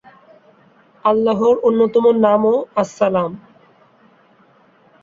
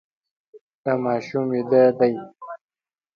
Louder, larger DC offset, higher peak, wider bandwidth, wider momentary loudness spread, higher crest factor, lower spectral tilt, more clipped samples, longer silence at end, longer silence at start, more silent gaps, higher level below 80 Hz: first, -16 LUFS vs -21 LUFS; neither; first, -2 dBFS vs -6 dBFS; first, 7.6 kHz vs 6.8 kHz; second, 8 LU vs 22 LU; about the same, 16 dB vs 18 dB; about the same, -7 dB/octave vs -8 dB/octave; neither; first, 1.65 s vs 0.6 s; first, 1.05 s vs 0.55 s; second, none vs 0.61-0.84 s; first, -62 dBFS vs -70 dBFS